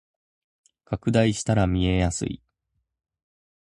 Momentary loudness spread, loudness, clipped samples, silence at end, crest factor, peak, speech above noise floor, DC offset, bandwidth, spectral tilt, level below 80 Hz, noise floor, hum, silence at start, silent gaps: 11 LU; -24 LUFS; under 0.1%; 1.25 s; 20 dB; -6 dBFS; 55 dB; under 0.1%; 11 kHz; -6 dB/octave; -40 dBFS; -77 dBFS; none; 0.9 s; none